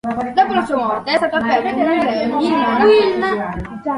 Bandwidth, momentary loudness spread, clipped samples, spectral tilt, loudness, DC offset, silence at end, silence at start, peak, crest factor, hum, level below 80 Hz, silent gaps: 11.5 kHz; 7 LU; under 0.1%; -6 dB/octave; -16 LUFS; under 0.1%; 0 s; 0.05 s; -2 dBFS; 14 dB; none; -44 dBFS; none